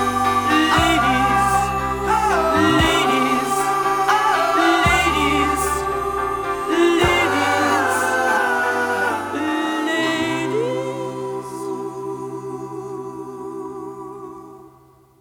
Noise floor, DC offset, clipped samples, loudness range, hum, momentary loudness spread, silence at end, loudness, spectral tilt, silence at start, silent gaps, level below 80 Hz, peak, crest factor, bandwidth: -51 dBFS; under 0.1%; under 0.1%; 13 LU; none; 15 LU; 0.5 s; -18 LUFS; -4 dB/octave; 0 s; none; -38 dBFS; -4 dBFS; 16 dB; over 20 kHz